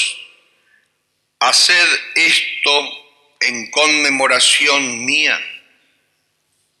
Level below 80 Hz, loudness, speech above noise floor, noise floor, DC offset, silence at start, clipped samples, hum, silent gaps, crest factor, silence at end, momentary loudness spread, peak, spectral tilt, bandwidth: -76 dBFS; -12 LUFS; 53 dB; -68 dBFS; under 0.1%; 0 s; under 0.1%; none; none; 16 dB; 1.2 s; 10 LU; 0 dBFS; 0.5 dB/octave; 14.5 kHz